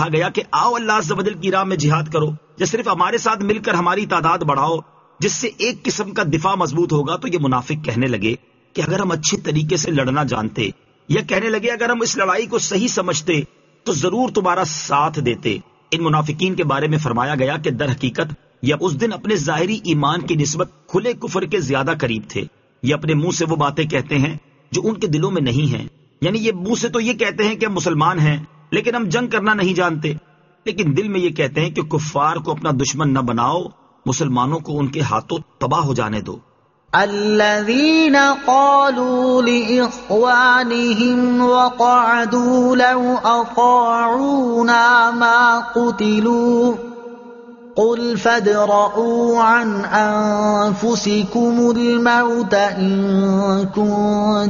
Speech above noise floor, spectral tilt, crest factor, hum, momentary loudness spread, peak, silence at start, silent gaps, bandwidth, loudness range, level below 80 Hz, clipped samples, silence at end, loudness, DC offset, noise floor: 21 dB; -4.5 dB/octave; 16 dB; none; 9 LU; -2 dBFS; 0 s; none; 7.4 kHz; 6 LU; -52 dBFS; under 0.1%; 0 s; -17 LUFS; under 0.1%; -38 dBFS